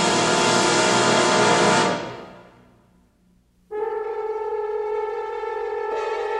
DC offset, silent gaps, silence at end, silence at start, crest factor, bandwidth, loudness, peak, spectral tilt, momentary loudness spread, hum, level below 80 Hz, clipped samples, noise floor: under 0.1%; none; 0 s; 0 s; 16 dB; 12.5 kHz; -21 LUFS; -6 dBFS; -3 dB/octave; 12 LU; none; -58 dBFS; under 0.1%; -60 dBFS